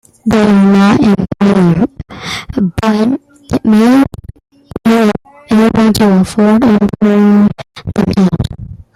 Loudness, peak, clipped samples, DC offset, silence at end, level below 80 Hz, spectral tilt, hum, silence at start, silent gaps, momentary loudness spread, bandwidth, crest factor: -10 LUFS; 0 dBFS; under 0.1%; under 0.1%; 0.2 s; -36 dBFS; -7 dB/octave; none; 0.25 s; none; 13 LU; 13.5 kHz; 10 dB